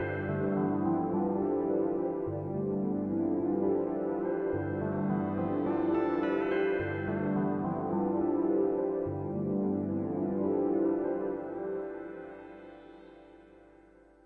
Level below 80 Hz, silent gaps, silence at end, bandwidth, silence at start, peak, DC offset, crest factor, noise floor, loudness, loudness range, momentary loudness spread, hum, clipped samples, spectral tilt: -64 dBFS; none; 0.65 s; 4.2 kHz; 0 s; -18 dBFS; under 0.1%; 14 dB; -58 dBFS; -31 LUFS; 3 LU; 7 LU; 50 Hz at -60 dBFS; under 0.1%; -11 dB/octave